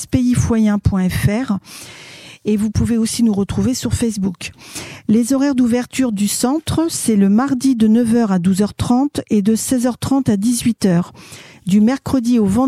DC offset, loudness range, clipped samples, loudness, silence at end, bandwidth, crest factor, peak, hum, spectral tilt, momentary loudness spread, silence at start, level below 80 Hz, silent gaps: under 0.1%; 3 LU; under 0.1%; -16 LUFS; 0 s; 15.5 kHz; 14 dB; -2 dBFS; none; -6 dB/octave; 13 LU; 0 s; -38 dBFS; none